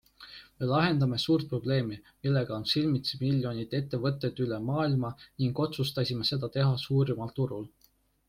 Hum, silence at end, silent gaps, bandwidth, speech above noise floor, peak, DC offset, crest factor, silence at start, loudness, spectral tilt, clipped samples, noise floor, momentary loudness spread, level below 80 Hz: none; 0.6 s; none; 15.5 kHz; 38 dB; -14 dBFS; under 0.1%; 16 dB; 0.2 s; -30 LUFS; -7 dB/octave; under 0.1%; -67 dBFS; 9 LU; -60 dBFS